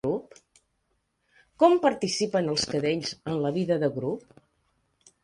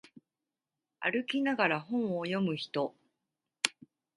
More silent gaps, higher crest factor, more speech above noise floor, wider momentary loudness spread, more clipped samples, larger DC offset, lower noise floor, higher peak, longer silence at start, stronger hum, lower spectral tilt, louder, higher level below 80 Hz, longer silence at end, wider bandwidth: neither; second, 20 dB vs 30 dB; second, 49 dB vs over 58 dB; first, 11 LU vs 6 LU; neither; neither; second, -75 dBFS vs under -90 dBFS; about the same, -6 dBFS vs -6 dBFS; second, 0.05 s vs 1 s; neither; about the same, -5 dB/octave vs -4 dB/octave; first, -26 LUFS vs -32 LUFS; first, -64 dBFS vs -82 dBFS; first, 1.05 s vs 0.45 s; about the same, 11.5 kHz vs 11.5 kHz